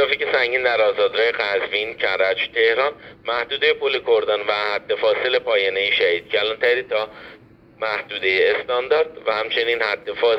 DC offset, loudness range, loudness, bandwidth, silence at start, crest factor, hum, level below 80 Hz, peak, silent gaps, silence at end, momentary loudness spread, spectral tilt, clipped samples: under 0.1%; 2 LU; -20 LUFS; 6 kHz; 0 s; 16 dB; none; -60 dBFS; -4 dBFS; none; 0 s; 6 LU; -4 dB/octave; under 0.1%